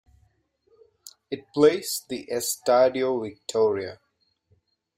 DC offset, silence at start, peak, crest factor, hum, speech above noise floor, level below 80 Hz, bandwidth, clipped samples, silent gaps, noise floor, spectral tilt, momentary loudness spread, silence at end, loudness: under 0.1%; 1.3 s; -6 dBFS; 20 dB; none; 44 dB; -68 dBFS; 16 kHz; under 0.1%; none; -67 dBFS; -3.5 dB/octave; 13 LU; 1.05 s; -24 LUFS